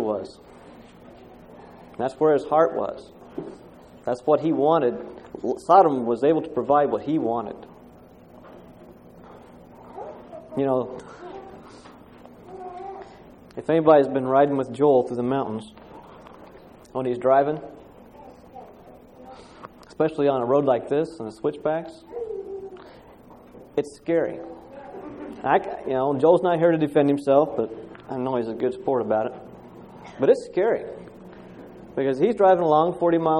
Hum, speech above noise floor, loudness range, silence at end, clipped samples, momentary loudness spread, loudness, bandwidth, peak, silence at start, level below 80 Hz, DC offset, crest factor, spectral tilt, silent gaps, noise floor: none; 27 dB; 10 LU; 0 s; under 0.1%; 25 LU; -22 LUFS; 10.5 kHz; -4 dBFS; 0 s; -60 dBFS; under 0.1%; 20 dB; -7.5 dB/octave; none; -48 dBFS